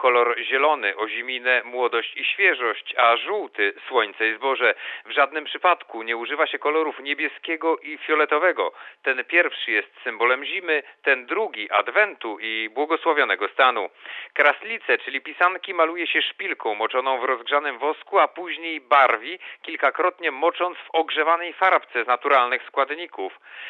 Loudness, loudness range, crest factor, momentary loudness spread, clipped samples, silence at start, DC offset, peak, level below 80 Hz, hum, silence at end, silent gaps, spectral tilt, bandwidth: -22 LUFS; 2 LU; 20 dB; 9 LU; under 0.1%; 0 s; under 0.1%; -2 dBFS; under -90 dBFS; none; 0 s; none; -3.5 dB/octave; 4.6 kHz